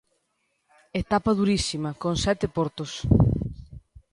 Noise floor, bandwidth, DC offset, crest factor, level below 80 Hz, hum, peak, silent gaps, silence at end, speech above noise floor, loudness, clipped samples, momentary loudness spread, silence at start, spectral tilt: -74 dBFS; 11.5 kHz; under 0.1%; 20 dB; -38 dBFS; none; -6 dBFS; none; 0.35 s; 50 dB; -25 LUFS; under 0.1%; 11 LU; 0.95 s; -6 dB/octave